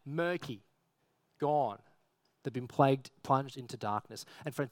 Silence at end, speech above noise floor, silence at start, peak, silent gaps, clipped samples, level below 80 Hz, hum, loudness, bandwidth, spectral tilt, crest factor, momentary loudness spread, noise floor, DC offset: 0 s; 43 dB; 0.05 s; -12 dBFS; none; under 0.1%; -78 dBFS; none; -34 LUFS; 17 kHz; -6.5 dB/octave; 24 dB; 16 LU; -77 dBFS; under 0.1%